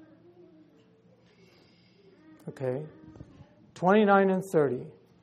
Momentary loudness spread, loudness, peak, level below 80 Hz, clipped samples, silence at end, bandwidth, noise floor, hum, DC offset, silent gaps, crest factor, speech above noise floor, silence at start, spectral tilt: 25 LU; -26 LUFS; -8 dBFS; -70 dBFS; under 0.1%; 0.3 s; 13 kHz; -61 dBFS; none; under 0.1%; none; 22 dB; 35 dB; 2.45 s; -7.5 dB/octave